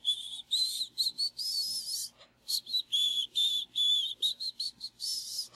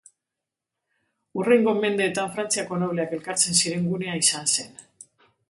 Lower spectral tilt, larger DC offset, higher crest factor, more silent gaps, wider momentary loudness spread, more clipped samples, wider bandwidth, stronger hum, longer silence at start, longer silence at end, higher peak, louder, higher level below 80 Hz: second, 2.5 dB/octave vs -3 dB/octave; neither; about the same, 16 dB vs 20 dB; neither; about the same, 9 LU vs 8 LU; neither; first, 16 kHz vs 12 kHz; neither; second, 0.05 s vs 1.35 s; second, 0.1 s vs 0.7 s; second, -18 dBFS vs -6 dBFS; second, -30 LUFS vs -23 LUFS; second, -78 dBFS vs -70 dBFS